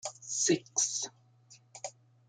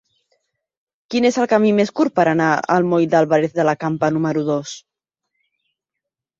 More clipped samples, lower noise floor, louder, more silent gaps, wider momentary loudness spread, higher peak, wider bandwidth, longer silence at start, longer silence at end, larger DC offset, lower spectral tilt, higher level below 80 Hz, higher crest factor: neither; second, -61 dBFS vs -83 dBFS; second, -31 LUFS vs -17 LUFS; neither; first, 17 LU vs 7 LU; second, -16 dBFS vs -2 dBFS; first, 10 kHz vs 7.8 kHz; second, 0.05 s vs 1.1 s; second, 0.4 s vs 1.6 s; neither; second, -2 dB/octave vs -6 dB/octave; second, -80 dBFS vs -62 dBFS; about the same, 20 dB vs 18 dB